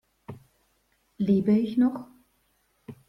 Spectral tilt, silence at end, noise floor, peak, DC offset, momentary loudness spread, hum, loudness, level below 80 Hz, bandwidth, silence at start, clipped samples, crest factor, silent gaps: -9.5 dB/octave; 0.15 s; -70 dBFS; -12 dBFS; under 0.1%; 24 LU; none; -24 LUFS; -64 dBFS; 5.8 kHz; 0.3 s; under 0.1%; 18 dB; none